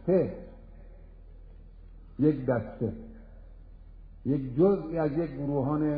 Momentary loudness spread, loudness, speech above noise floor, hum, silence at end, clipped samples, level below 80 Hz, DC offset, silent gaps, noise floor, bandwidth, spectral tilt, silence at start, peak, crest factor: 20 LU; -29 LUFS; 21 dB; none; 0 s; under 0.1%; -48 dBFS; under 0.1%; none; -48 dBFS; 4.9 kHz; -12.5 dB/octave; 0 s; -12 dBFS; 18 dB